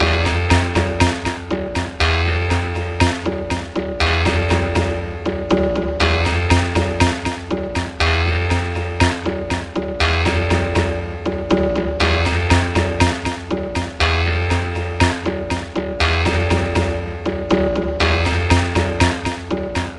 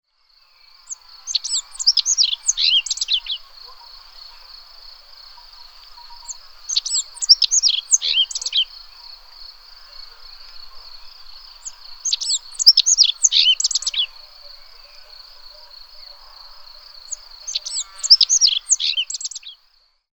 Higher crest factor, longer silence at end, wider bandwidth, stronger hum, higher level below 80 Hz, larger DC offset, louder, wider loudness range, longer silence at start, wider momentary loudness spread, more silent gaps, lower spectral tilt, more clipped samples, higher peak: about the same, 18 dB vs 22 dB; second, 0 s vs 0.65 s; second, 11.5 kHz vs over 20 kHz; neither; first, -30 dBFS vs -52 dBFS; second, under 0.1% vs 0.2%; second, -19 LUFS vs -15 LUFS; second, 2 LU vs 18 LU; second, 0 s vs 0.9 s; second, 8 LU vs 27 LU; neither; first, -5.5 dB/octave vs 6.5 dB/octave; neither; about the same, 0 dBFS vs 0 dBFS